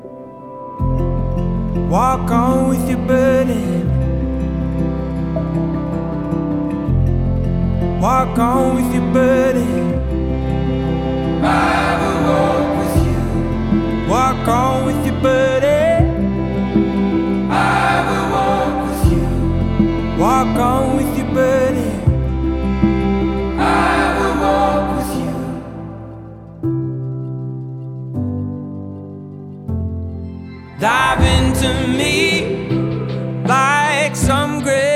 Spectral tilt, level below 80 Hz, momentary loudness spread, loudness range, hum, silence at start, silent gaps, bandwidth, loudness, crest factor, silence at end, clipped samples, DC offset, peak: -6.5 dB/octave; -26 dBFS; 12 LU; 7 LU; none; 0 s; none; 16.5 kHz; -17 LUFS; 16 dB; 0 s; under 0.1%; under 0.1%; 0 dBFS